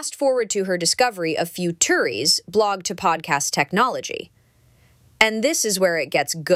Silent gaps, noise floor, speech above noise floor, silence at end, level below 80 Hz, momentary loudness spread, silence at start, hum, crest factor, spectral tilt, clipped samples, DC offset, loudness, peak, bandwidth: none; -56 dBFS; 35 dB; 0 s; -62 dBFS; 6 LU; 0 s; none; 22 dB; -2.5 dB/octave; under 0.1%; under 0.1%; -20 LUFS; 0 dBFS; 16.5 kHz